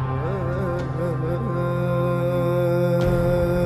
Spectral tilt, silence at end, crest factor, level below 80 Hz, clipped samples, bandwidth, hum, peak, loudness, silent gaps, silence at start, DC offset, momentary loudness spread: -9 dB/octave; 0 s; 12 dB; -36 dBFS; under 0.1%; 13.5 kHz; none; -10 dBFS; -23 LUFS; none; 0 s; under 0.1%; 5 LU